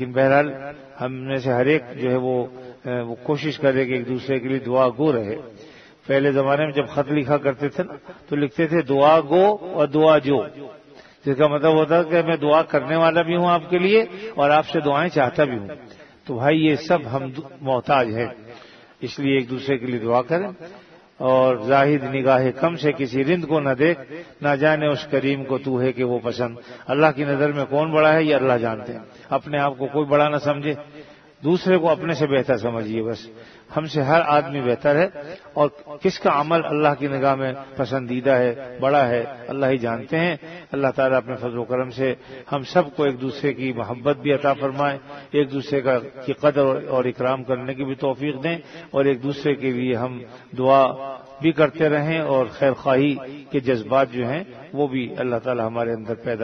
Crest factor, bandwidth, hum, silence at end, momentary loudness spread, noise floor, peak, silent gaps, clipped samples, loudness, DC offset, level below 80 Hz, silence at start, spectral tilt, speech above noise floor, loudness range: 20 dB; 6.4 kHz; none; 0 s; 12 LU; -44 dBFS; -2 dBFS; none; under 0.1%; -21 LUFS; under 0.1%; -60 dBFS; 0 s; -7.5 dB/octave; 24 dB; 4 LU